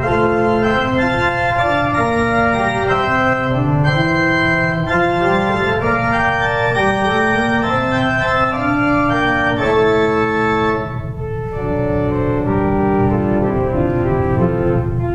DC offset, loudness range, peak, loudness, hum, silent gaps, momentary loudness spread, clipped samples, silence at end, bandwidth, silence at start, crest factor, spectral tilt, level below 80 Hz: under 0.1%; 2 LU; -2 dBFS; -16 LUFS; none; none; 3 LU; under 0.1%; 0 s; 9.6 kHz; 0 s; 14 dB; -7 dB/octave; -32 dBFS